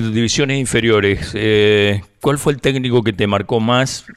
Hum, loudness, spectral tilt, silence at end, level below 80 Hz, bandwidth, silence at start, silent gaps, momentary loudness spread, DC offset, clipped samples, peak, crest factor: none; -15 LUFS; -5 dB/octave; 0.05 s; -40 dBFS; 14 kHz; 0 s; none; 5 LU; under 0.1%; under 0.1%; -4 dBFS; 12 dB